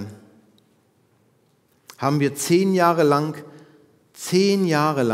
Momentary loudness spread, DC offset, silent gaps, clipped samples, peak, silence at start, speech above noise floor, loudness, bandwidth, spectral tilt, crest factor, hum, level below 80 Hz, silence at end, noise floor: 14 LU; under 0.1%; none; under 0.1%; -4 dBFS; 0 s; 43 dB; -20 LUFS; 16 kHz; -5.5 dB/octave; 20 dB; none; -76 dBFS; 0 s; -62 dBFS